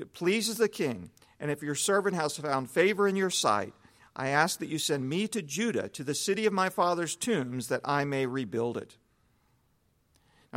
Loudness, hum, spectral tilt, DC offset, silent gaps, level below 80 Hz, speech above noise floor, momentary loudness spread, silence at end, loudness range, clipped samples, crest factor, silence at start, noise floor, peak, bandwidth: -29 LUFS; none; -4 dB/octave; under 0.1%; none; -72 dBFS; 41 dB; 8 LU; 0 s; 4 LU; under 0.1%; 22 dB; 0 s; -70 dBFS; -10 dBFS; 16.5 kHz